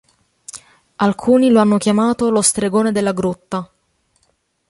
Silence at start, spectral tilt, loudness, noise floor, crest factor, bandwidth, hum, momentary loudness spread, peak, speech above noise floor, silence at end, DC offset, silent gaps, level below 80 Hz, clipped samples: 0.55 s; -5 dB/octave; -16 LUFS; -64 dBFS; 16 dB; 11.5 kHz; none; 21 LU; -2 dBFS; 49 dB; 1.05 s; under 0.1%; none; -54 dBFS; under 0.1%